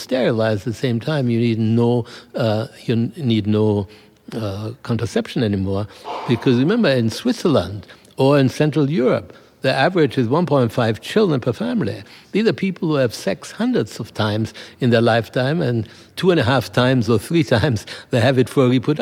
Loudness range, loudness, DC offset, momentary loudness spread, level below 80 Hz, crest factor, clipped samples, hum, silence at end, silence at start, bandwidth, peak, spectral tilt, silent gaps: 4 LU; -19 LUFS; under 0.1%; 10 LU; -54 dBFS; 16 dB; under 0.1%; none; 0 s; 0 s; 15.5 kHz; -2 dBFS; -7 dB/octave; none